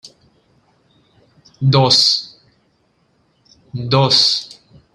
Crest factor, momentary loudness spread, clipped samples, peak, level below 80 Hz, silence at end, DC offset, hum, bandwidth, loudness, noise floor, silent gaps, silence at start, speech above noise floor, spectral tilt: 20 dB; 22 LU; under 0.1%; 0 dBFS; -54 dBFS; 0.5 s; under 0.1%; none; 12.5 kHz; -13 LUFS; -61 dBFS; none; 0.05 s; 47 dB; -4.5 dB/octave